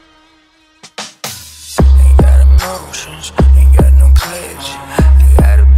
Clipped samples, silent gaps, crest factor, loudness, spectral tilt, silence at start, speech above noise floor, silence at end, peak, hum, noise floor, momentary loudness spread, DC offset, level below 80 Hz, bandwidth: under 0.1%; none; 8 dB; -9 LUFS; -6 dB/octave; 1 s; 42 dB; 0 s; 0 dBFS; none; -49 dBFS; 17 LU; under 0.1%; -8 dBFS; 14 kHz